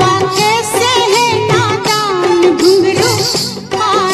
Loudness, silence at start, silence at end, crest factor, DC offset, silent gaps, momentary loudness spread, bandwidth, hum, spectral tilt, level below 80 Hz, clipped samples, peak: -11 LUFS; 0 s; 0 s; 12 dB; under 0.1%; none; 4 LU; 13.5 kHz; none; -3.5 dB/octave; -46 dBFS; under 0.1%; 0 dBFS